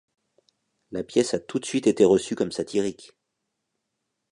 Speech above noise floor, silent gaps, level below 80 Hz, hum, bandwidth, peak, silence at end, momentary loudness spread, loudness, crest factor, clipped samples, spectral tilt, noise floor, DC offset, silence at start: 57 dB; none; -62 dBFS; none; 11 kHz; -6 dBFS; 1.4 s; 11 LU; -24 LUFS; 20 dB; under 0.1%; -5 dB/octave; -80 dBFS; under 0.1%; 0.9 s